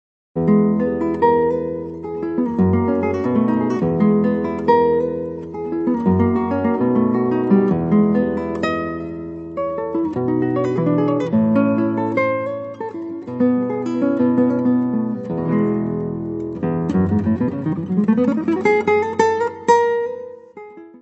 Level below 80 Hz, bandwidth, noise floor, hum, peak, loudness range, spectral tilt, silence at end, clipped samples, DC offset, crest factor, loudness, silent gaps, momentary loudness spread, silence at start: -50 dBFS; 8 kHz; -38 dBFS; none; -2 dBFS; 2 LU; -8.5 dB/octave; 0.05 s; under 0.1%; under 0.1%; 16 dB; -19 LUFS; none; 11 LU; 0.35 s